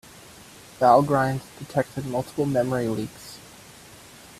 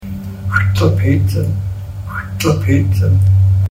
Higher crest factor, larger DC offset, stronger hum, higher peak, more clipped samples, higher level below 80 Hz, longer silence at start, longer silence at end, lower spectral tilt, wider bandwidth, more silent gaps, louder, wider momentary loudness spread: first, 22 dB vs 14 dB; neither; neither; second, -4 dBFS vs 0 dBFS; neither; second, -58 dBFS vs -34 dBFS; first, 0.4 s vs 0 s; first, 0.45 s vs 0 s; about the same, -6.5 dB/octave vs -7 dB/octave; about the same, 15 kHz vs 15.5 kHz; neither; second, -23 LUFS vs -15 LUFS; first, 27 LU vs 13 LU